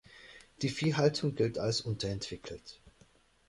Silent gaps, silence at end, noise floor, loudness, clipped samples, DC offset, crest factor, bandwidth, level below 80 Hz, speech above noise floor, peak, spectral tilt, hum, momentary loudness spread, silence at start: none; 0.6 s; -65 dBFS; -33 LUFS; under 0.1%; under 0.1%; 20 dB; 11.5 kHz; -60 dBFS; 32 dB; -14 dBFS; -5.5 dB/octave; none; 23 LU; 0.1 s